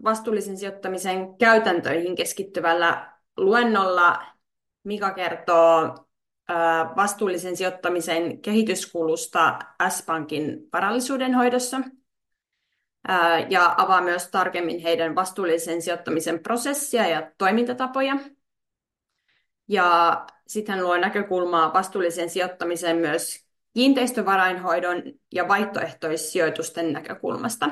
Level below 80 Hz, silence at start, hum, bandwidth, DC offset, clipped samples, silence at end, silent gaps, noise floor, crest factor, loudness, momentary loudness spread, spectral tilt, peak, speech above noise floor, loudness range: -74 dBFS; 0 s; none; 12.5 kHz; under 0.1%; under 0.1%; 0 s; none; -84 dBFS; 18 dB; -23 LUFS; 11 LU; -3.5 dB/octave; -6 dBFS; 62 dB; 3 LU